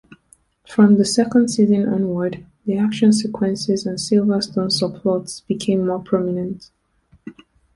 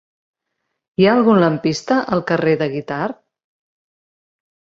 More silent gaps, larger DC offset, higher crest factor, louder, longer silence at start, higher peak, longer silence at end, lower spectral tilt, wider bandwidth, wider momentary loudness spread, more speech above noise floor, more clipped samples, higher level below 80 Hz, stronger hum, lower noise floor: neither; neither; about the same, 16 dB vs 18 dB; about the same, -19 LUFS vs -17 LUFS; second, 0.7 s vs 1 s; about the same, -2 dBFS vs -2 dBFS; second, 0.45 s vs 1.55 s; about the same, -5.5 dB/octave vs -6.5 dB/octave; first, 11.5 kHz vs 7.8 kHz; about the same, 9 LU vs 11 LU; second, 39 dB vs 60 dB; neither; about the same, -56 dBFS vs -58 dBFS; neither; second, -57 dBFS vs -76 dBFS